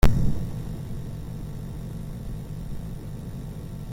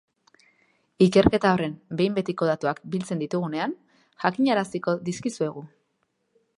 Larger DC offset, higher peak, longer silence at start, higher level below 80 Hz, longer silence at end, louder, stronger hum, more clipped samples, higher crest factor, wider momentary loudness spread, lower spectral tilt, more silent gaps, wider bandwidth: neither; about the same, -4 dBFS vs -2 dBFS; second, 0 s vs 1 s; first, -30 dBFS vs -50 dBFS; second, 0 s vs 0.9 s; second, -33 LUFS vs -25 LUFS; neither; neither; about the same, 22 dB vs 22 dB; second, 8 LU vs 11 LU; about the same, -7 dB/octave vs -6.5 dB/octave; neither; first, 16.5 kHz vs 11 kHz